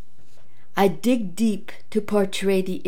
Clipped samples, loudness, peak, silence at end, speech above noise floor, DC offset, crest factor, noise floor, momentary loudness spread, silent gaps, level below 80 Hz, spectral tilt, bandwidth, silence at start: under 0.1%; -23 LUFS; -6 dBFS; 0.05 s; 35 dB; 4%; 20 dB; -58 dBFS; 8 LU; none; -64 dBFS; -5.5 dB/octave; 17 kHz; 0.75 s